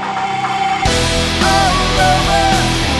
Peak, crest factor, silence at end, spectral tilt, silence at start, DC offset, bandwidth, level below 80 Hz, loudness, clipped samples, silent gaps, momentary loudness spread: 0 dBFS; 14 dB; 0 s; -3.5 dB/octave; 0 s; under 0.1%; 12.5 kHz; -24 dBFS; -13 LUFS; under 0.1%; none; 5 LU